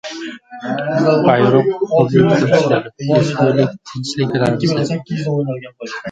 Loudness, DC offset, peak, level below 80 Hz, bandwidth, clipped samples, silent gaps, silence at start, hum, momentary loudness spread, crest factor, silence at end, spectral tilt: -15 LUFS; under 0.1%; 0 dBFS; -52 dBFS; 9.2 kHz; under 0.1%; none; 0.05 s; none; 15 LU; 16 dB; 0 s; -7 dB/octave